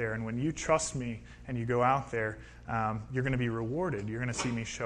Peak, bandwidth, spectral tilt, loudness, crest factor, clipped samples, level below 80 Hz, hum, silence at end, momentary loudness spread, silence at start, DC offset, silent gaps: -14 dBFS; 11 kHz; -5.5 dB/octave; -32 LUFS; 20 dB; under 0.1%; -52 dBFS; none; 0 s; 9 LU; 0 s; under 0.1%; none